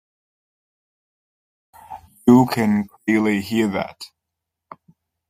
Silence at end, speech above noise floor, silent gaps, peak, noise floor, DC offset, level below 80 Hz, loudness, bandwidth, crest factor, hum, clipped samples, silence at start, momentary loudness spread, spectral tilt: 1.25 s; 65 dB; none; -2 dBFS; -82 dBFS; under 0.1%; -60 dBFS; -19 LUFS; 15.5 kHz; 20 dB; none; under 0.1%; 1.9 s; 25 LU; -6.5 dB/octave